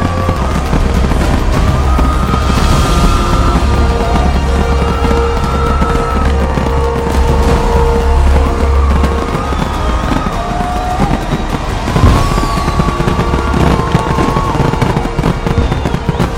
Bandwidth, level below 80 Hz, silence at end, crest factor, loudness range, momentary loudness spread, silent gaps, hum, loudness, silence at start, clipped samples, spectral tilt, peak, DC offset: 15 kHz; -14 dBFS; 0 s; 10 dB; 2 LU; 4 LU; none; none; -13 LUFS; 0 s; under 0.1%; -6.5 dB/octave; 0 dBFS; under 0.1%